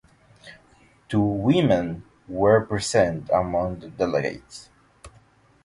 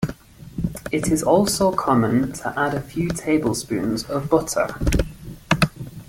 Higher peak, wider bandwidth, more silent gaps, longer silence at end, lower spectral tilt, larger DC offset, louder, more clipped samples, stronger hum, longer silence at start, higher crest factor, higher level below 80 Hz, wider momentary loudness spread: second, -6 dBFS vs -2 dBFS; second, 11.5 kHz vs 17 kHz; neither; first, 0.55 s vs 0.05 s; about the same, -6 dB/octave vs -5 dB/octave; neither; about the same, -23 LUFS vs -22 LUFS; neither; neither; first, 0.45 s vs 0 s; about the same, 18 dB vs 20 dB; second, -48 dBFS vs -36 dBFS; first, 17 LU vs 11 LU